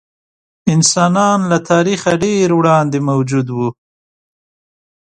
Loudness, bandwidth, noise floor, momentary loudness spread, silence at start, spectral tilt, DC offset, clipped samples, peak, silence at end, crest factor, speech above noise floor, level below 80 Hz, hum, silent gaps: -14 LUFS; 10.5 kHz; under -90 dBFS; 8 LU; 0.65 s; -5 dB/octave; under 0.1%; under 0.1%; 0 dBFS; 1.35 s; 14 dB; over 77 dB; -54 dBFS; none; none